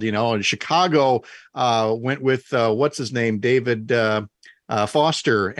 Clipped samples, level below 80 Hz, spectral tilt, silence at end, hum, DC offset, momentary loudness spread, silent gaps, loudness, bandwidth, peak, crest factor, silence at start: under 0.1%; -64 dBFS; -5 dB/octave; 0.05 s; none; under 0.1%; 6 LU; none; -20 LUFS; 11.5 kHz; -6 dBFS; 14 dB; 0 s